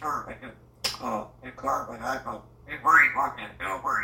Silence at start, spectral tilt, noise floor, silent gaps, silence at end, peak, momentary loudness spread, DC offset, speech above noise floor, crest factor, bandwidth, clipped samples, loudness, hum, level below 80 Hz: 0 s; -2.5 dB/octave; -46 dBFS; none; 0 s; -6 dBFS; 23 LU; under 0.1%; 16 dB; 22 dB; 16.5 kHz; under 0.1%; -26 LUFS; none; -56 dBFS